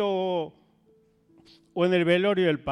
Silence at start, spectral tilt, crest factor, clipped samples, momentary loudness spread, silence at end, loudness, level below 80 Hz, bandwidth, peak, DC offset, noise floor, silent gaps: 0 s; -7 dB/octave; 16 dB; under 0.1%; 13 LU; 0 s; -24 LUFS; -68 dBFS; 10.5 kHz; -10 dBFS; under 0.1%; -63 dBFS; none